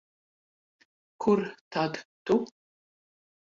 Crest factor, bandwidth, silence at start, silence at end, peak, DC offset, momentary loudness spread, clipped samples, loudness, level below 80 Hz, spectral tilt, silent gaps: 20 dB; 7.6 kHz; 1.2 s; 1.05 s; -12 dBFS; under 0.1%; 10 LU; under 0.1%; -29 LUFS; -70 dBFS; -6.5 dB/octave; 1.61-1.71 s, 2.05-2.26 s